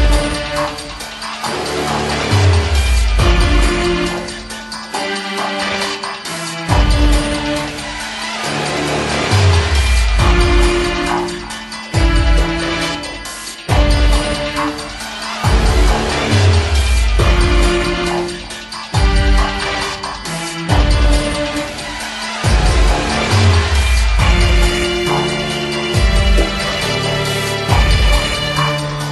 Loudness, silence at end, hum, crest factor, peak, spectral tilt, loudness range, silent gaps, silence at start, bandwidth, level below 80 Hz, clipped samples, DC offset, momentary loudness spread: -16 LUFS; 0 s; none; 14 dB; 0 dBFS; -4.5 dB/octave; 3 LU; none; 0 s; 12.5 kHz; -18 dBFS; under 0.1%; under 0.1%; 10 LU